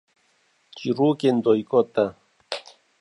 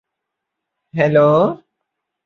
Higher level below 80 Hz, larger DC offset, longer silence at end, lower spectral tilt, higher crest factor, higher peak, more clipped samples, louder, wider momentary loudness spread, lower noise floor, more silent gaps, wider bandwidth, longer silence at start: second, -70 dBFS vs -60 dBFS; neither; second, 0.4 s vs 0.7 s; second, -7 dB/octave vs -8.5 dB/octave; about the same, 18 dB vs 16 dB; second, -6 dBFS vs -2 dBFS; neither; second, -23 LUFS vs -15 LUFS; second, 14 LU vs 17 LU; second, -65 dBFS vs -79 dBFS; neither; first, 11 kHz vs 6.6 kHz; second, 0.75 s vs 0.95 s